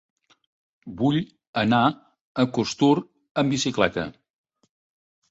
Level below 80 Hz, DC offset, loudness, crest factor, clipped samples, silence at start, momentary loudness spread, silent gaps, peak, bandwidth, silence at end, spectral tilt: -58 dBFS; under 0.1%; -24 LUFS; 20 dB; under 0.1%; 0.85 s; 13 LU; 1.47-1.53 s, 2.21-2.35 s, 3.31-3.35 s; -6 dBFS; 8 kHz; 1.2 s; -5.5 dB/octave